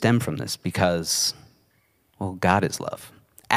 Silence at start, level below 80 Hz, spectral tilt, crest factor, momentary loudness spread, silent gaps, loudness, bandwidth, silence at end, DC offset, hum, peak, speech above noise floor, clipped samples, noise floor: 0 s; -56 dBFS; -4 dB/octave; 24 dB; 13 LU; none; -24 LUFS; 16 kHz; 0 s; under 0.1%; none; -2 dBFS; 41 dB; under 0.1%; -65 dBFS